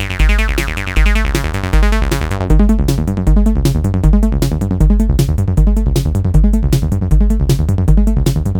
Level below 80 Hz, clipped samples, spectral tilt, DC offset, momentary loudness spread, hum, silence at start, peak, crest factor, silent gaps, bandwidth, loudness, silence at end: -14 dBFS; under 0.1%; -6.5 dB/octave; 0.5%; 3 LU; none; 0 s; 0 dBFS; 12 dB; none; 17 kHz; -14 LUFS; 0 s